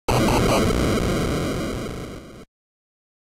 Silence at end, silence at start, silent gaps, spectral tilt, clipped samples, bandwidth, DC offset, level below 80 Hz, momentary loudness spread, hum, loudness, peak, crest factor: 0.85 s; 0.1 s; none; -5.5 dB/octave; under 0.1%; 16 kHz; under 0.1%; -32 dBFS; 15 LU; none; -22 LUFS; -10 dBFS; 12 dB